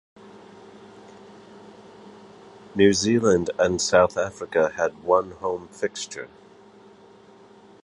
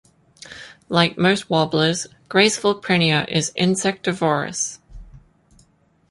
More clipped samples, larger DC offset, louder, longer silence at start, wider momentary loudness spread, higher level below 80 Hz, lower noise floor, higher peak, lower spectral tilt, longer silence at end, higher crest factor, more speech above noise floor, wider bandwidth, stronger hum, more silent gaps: neither; neither; second, -22 LUFS vs -19 LUFS; first, 0.85 s vs 0.45 s; first, 14 LU vs 10 LU; about the same, -54 dBFS vs -52 dBFS; second, -50 dBFS vs -59 dBFS; about the same, -4 dBFS vs -2 dBFS; about the same, -4 dB/octave vs -4 dB/octave; first, 1.6 s vs 0.9 s; about the same, 22 dB vs 20 dB; second, 28 dB vs 39 dB; about the same, 11.5 kHz vs 11.5 kHz; neither; neither